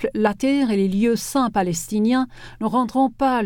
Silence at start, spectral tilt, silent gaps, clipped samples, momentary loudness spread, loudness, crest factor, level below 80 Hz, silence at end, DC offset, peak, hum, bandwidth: 0 s; -5.5 dB/octave; none; under 0.1%; 4 LU; -21 LUFS; 14 dB; -48 dBFS; 0 s; under 0.1%; -6 dBFS; none; 19 kHz